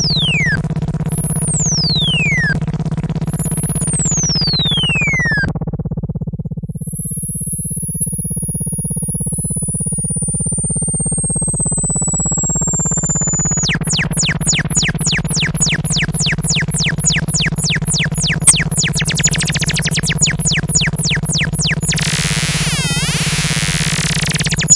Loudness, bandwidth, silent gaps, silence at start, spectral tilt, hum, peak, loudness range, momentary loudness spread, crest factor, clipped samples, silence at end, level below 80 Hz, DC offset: -15 LUFS; 12 kHz; none; 0 s; -2.5 dB/octave; none; 0 dBFS; 4 LU; 6 LU; 16 dB; under 0.1%; 0 s; -32 dBFS; under 0.1%